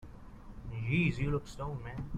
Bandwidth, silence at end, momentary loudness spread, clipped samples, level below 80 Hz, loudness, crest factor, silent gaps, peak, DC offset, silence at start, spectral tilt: 10.5 kHz; 0 s; 22 LU; under 0.1%; -48 dBFS; -35 LUFS; 16 dB; none; -18 dBFS; under 0.1%; 0 s; -7.5 dB/octave